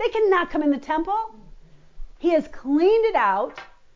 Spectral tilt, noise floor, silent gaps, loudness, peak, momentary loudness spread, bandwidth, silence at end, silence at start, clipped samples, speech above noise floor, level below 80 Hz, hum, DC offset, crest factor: -5.5 dB/octave; -45 dBFS; none; -22 LUFS; -8 dBFS; 9 LU; 7.4 kHz; 0.3 s; 0 s; under 0.1%; 24 dB; -48 dBFS; none; under 0.1%; 14 dB